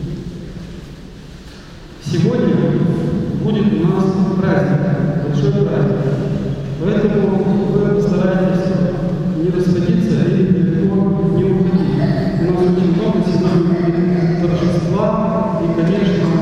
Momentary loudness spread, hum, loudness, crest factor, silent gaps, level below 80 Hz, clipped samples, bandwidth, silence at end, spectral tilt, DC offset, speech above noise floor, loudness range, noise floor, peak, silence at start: 12 LU; none; -16 LUFS; 14 dB; none; -36 dBFS; under 0.1%; 7.8 kHz; 0 s; -9 dB/octave; under 0.1%; 20 dB; 2 LU; -35 dBFS; 0 dBFS; 0 s